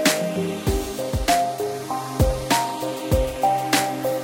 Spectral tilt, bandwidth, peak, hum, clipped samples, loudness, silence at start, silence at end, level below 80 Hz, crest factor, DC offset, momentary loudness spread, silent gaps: -4 dB/octave; 17 kHz; -4 dBFS; none; under 0.1%; -23 LUFS; 0 s; 0 s; -32 dBFS; 18 dB; under 0.1%; 7 LU; none